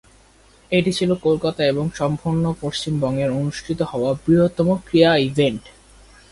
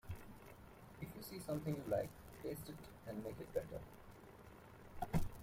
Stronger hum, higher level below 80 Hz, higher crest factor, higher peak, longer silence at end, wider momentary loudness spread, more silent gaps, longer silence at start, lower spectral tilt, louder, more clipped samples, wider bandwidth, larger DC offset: neither; first, -48 dBFS vs -56 dBFS; about the same, 18 dB vs 20 dB; first, -2 dBFS vs -26 dBFS; first, 0.65 s vs 0 s; second, 8 LU vs 18 LU; neither; first, 0.7 s vs 0.05 s; about the same, -6.5 dB/octave vs -6.5 dB/octave; first, -20 LUFS vs -47 LUFS; neither; second, 11.5 kHz vs 16.5 kHz; neither